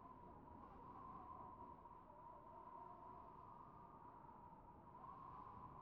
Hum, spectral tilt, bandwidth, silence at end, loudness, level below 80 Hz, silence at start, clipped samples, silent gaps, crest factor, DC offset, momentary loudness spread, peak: none; -7.5 dB/octave; 4.3 kHz; 0 s; -60 LUFS; -74 dBFS; 0 s; under 0.1%; none; 14 dB; under 0.1%; 4 LU; -46 dBFS